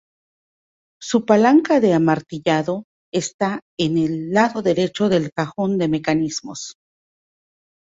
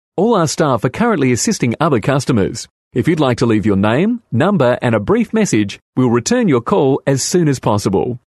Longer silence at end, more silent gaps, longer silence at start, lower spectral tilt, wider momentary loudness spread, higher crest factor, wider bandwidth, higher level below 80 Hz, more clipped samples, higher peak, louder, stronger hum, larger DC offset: first, 1.2 s vs 0.2 s; first, 2.84-3.12 s, 3.34-3.39 s, 3.62-3.77 s, 5.32-5.36 s vs 2.70-2.91 s, 5.82-5.93 s; first, 1 s vs 0.15 s; about the same, -5.5 dB/octave vs -5.5 dB/octave; first, 12 LU vs 4 LU; about the same, 18 dB vs 14 dB; second, 8 kHz vs 12.5 kHz; second, -58 dBFS vs -46 dBFS; neither; about the same, -2 dBFS vs -2 dBFS; second, -19 LUFS vs -15 LUFS; neither; neither